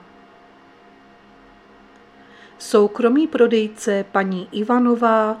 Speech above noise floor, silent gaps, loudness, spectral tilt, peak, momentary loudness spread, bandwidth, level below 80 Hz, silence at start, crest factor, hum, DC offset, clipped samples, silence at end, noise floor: 31 dB; none; -18 LUFS; -5.5 dB/octave; -2 dBFS; 7 LU; 13 kHz; -66 dBFS; 2.6 s; 18 dB; none; under 0.1%; under 0.1%; 0 s; -48 dBFS